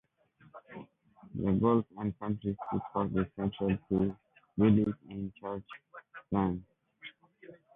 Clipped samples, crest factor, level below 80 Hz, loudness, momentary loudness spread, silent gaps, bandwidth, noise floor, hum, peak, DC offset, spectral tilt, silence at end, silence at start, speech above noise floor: under 0.1%; 20 dB; -56 dBFS; -32 LUFS; 23 LU; none; 3.8 kHz; -64 dBFS; none; -14 dBFS; under 0.1%; -11 dB/octave; 0.25 s; 0.55 s; 33 dB